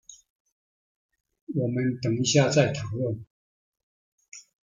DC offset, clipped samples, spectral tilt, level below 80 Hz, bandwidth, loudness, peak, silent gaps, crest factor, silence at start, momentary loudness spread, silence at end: under 0.1%; under 0.1%; -5 dB/octave; -62 dBFS; 9.4 kHz; -25 LUFS; -8 dBFS; 0.30-0.45 s, 0.52-1.09 s, 1.41-1.47 s, 3.30-3.73 s, 3.83-4.18 s, 4.28-4.32 s; 20 dB; 0.1 s; 24 LU; 0.35 s